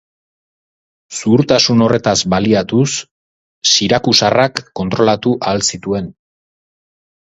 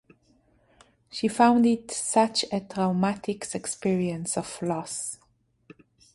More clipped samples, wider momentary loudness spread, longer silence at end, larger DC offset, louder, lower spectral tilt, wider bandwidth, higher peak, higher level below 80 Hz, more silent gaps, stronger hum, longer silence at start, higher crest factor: neither; about the same, 11 LU vs 12 LU; first, 1.2 s vs 1 s; neither; first, -13 LUFS vs -26 LUFS; about the same, -4 dB/octave vs -4.5 dB/octave; about the same, 10.5 kHz vs 11.5 kHz; first, 0 dBFS vs -8 dBFS; first, -46 dBFS vs -64 dBFS; first, 3.11-3.61 s vs none; neither; about the same, 1.1 s vs 1.15 s; about the same, 16 dB vs 20 dB